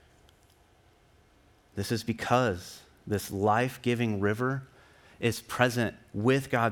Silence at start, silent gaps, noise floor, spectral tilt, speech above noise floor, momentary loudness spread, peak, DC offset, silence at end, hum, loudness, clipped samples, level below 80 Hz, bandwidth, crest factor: 1.75 s; none; -62 dBFS; -5.5 dB/octave; 34 dB; 11 LU; -8 dBFS; under 0.1%; 0 s; none; -29 LUFS; under 0.1%; -64 dBFS; 19 kHz; 22 dB